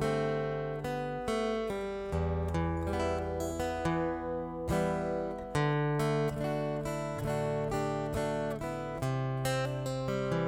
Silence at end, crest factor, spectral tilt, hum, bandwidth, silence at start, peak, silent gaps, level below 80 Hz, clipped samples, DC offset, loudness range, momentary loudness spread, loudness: 0 s; 14 dB; -6.5 dB/octave; none; 17 kHz; 0 s; -18 dBFS; none; -48 dBFS; under 0.1%; under 0.1%; 1 LU; 5 LU; -33 LUFS